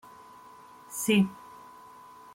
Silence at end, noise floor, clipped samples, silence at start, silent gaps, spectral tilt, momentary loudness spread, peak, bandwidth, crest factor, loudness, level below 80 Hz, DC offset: 1 s; -51 dBFS; under 0.1%; 0.9 s; none; -4.5 dB/octave; 26 LU; -14 dBFS; 16.5 kHz; 18 dB; -27 LUFS; -72 dBFS; under 0.1%